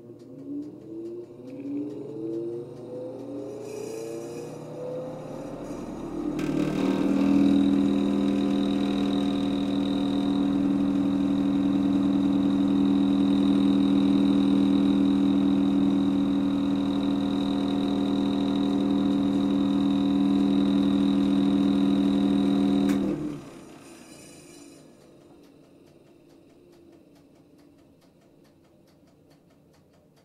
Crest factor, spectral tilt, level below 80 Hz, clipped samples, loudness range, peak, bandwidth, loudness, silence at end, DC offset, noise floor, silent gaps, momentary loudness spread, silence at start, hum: 14 dB; -7.5 dB/octave; -54 dBFS; under 0.1%; 13 LU; -10 dBFS; 10.5 kHz; -24 LUFS; 5.55 s; under 0.1%; -58 dBFS; none; 15 LU; 0.05 s; none